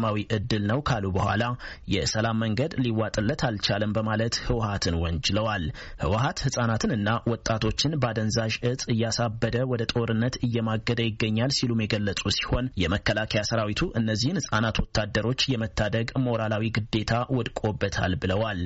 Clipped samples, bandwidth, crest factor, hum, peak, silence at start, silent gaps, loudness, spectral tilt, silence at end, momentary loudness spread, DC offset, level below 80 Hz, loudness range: under 0.1%; 8 kHz; 16 dB; none; -10 dBFS; 0 s; none; -26 LUFS; -4.5 dB/octave; 0 s; 2 LU; under 0.1%; -42 dBFS; 1 LU